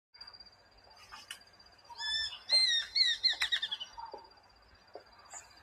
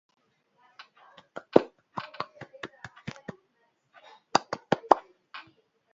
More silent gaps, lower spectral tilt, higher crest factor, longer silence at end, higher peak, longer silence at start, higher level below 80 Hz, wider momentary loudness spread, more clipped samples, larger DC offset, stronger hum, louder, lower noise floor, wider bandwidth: neither; second, 2 dB/octave vs -3.5 dB/octave; second, 22 dB vs 32 dB; second, 0.2 s vs 0.55 s; second, -14 dBFS vs 0 dBFS; second, 0.2 s vs 1.35 s; about the same, -70 dBFS vs -66 dBFS; first, 25 LU vs 21 LU; neither; neither; neither; about the same, -29 LUFS vs -28 LUFS; second, -62 dBFS vs -72 dBFS; first, 14.5 kHz vs 7.6 kHz